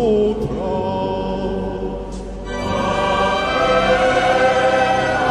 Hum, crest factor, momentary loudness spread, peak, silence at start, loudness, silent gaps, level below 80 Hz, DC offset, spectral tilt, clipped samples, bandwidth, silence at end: none; 16 dB; 11 LU; -2 dBFS; 0 s; -18 LUFS; none; -34 dBFS; under 0.1%; -5 dB/octave; under 0.1%; 11.5 kHz; 0 s